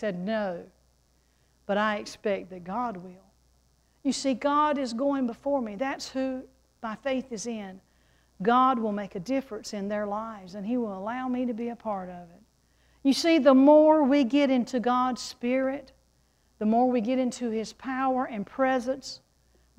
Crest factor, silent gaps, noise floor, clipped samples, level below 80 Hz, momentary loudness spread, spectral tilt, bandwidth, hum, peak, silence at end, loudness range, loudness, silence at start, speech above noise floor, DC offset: 20 dB; none; -66 dBFS; under 0.1%; -64 dBFS; 14 LU; -5 dB/octave; 12.5 kHz; none; -8 dBFS; 0.6 s; 10 LU; -27 LUFS; 0 s; 40 dB; under 0.1%